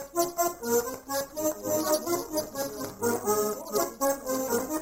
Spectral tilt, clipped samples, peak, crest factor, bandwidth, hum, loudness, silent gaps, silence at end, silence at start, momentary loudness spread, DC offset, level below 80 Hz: -3 dB/octave; under 0.1%; -10 dBFS; 18 dB; 16.5 kHz; none; -29 LUFS; none; 0 s; 0 s; 6 LU; under 0.1%; -60 dBFS